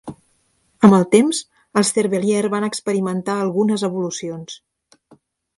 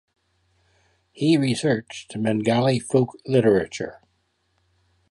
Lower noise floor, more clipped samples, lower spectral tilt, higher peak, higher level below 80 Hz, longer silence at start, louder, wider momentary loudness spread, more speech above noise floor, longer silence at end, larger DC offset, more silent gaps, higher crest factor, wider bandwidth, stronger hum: second, -63 dBFS vs -69 dBFS; neither; about the same, -5.5 dB/octave vs -6 dB/octave; first, 0 dBFS vs -6 dBFS; about the same, -62 dBFS vs -60 dBFS; second, 0.05 s vs 1.15 s; first, -18 LUFS vs -22 LUFS; first, 16 LU vs 12 LU; about the same, 46 dB vs 48 dB; second, 1 s vs 1.2 s; neither; neither; about the same, 18 dB vs 18 dB; about the same, 11.5 kHz vs 11.5 kHz; neither